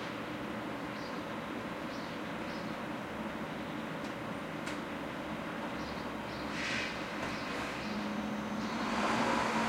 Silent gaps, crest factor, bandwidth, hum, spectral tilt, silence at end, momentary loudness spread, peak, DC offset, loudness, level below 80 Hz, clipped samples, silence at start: none; 18 dB; 16 kHz; none; -4.5 dB/octave; 0 s; 7 LU; -18 dBFS; under 0.1%; -38 LUFS; -60 dBFS; under 0.1%; 0 s